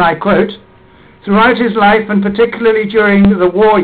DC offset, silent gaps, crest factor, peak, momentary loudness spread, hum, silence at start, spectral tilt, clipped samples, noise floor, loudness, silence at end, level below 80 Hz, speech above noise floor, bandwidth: under 0.1%; none; 10 dB; -2 dBFS; 5 LU; none; 0 s; -8.5 dB/octave; under 0.1%; -41 dBFS; -10 LUFS; 0 s; -36 dBFS; 32 dB; 4.7 kHz